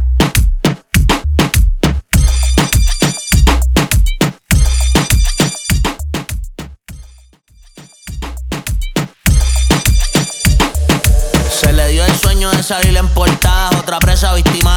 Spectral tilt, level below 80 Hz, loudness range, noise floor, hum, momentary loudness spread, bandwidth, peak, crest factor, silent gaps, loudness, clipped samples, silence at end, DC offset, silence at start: -4 dB/octave; -14 dBFS; 8 LU; -44 dBFS; none; 9 LU; over 20 kHz; 0 dBFS; 12 dB; none; -13 LUFS; under 0.1%; 0 s; under 0.1%; 0 s